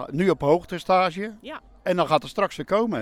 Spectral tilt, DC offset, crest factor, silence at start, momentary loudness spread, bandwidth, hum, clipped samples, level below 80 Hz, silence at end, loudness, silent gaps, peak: -6.5 dB/octave; under 0.1%; 18 dB; 0 s; 12 LU; 15 kHz; none; under 0.1%; -52 dBFS; 0 s; -23 LUFS; none; -6 dBFS